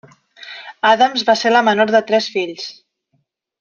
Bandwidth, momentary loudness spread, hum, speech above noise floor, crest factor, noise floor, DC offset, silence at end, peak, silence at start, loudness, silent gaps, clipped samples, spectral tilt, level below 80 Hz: 7.4 kHz; 19 LU; none; 52 dB; 16 dB; -67 dBFS; under 0.1%; 0.9 s; -2 dBFS; 0.4 s; -15 LUFS; none; under 0.1%; -3.5 dB/octave; -68 dBFS